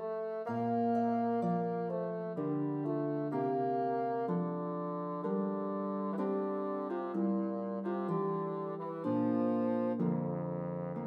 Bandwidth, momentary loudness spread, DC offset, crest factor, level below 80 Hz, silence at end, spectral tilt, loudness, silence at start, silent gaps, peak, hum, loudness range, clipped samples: 5.2 kHz; 6 LU; under 0.1%; 12 dB; -82 dBFS; 0 s; -11 dB/octave; -35 LUFS; 0 s; none; -22 dBFS; none; 2 LU; under 0.1%